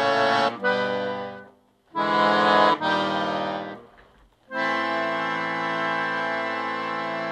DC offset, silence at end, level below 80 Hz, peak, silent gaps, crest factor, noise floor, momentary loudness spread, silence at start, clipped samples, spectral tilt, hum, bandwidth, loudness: under 0.1%; 0 s; -68 dBFS; -4 dBFS; none; 20 dB; -56 dBFS; 14 LU; 0 s; under 0.1%; -4.5 dB/octave; none; 10.5 kHz; -24 LUFS